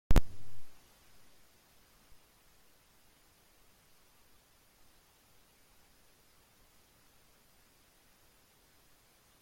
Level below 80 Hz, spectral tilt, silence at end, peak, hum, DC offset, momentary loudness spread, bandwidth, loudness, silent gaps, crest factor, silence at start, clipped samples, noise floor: -42 dBFS; -6 dB/octave; 8.7 s; -12 dBFS; none; under 0.1%; 4 LU; 16 kHz; -36 LUFS; none; 24 dB; 0.1 s; under 0.1%; -66 dBFS